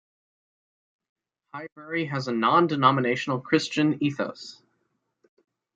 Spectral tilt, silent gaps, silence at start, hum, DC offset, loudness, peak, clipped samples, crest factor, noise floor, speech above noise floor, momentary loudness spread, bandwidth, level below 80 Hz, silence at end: -6 dB/octave; 1.72-1.76 s; 1.55 s; none; under 0.1%; -24 LUFS; -4 dBFS; under 0.1%; 22 dB; -75 dBFS; 51 dB; 19 LU; 9 kHz; -72 dBFS; 1.2 s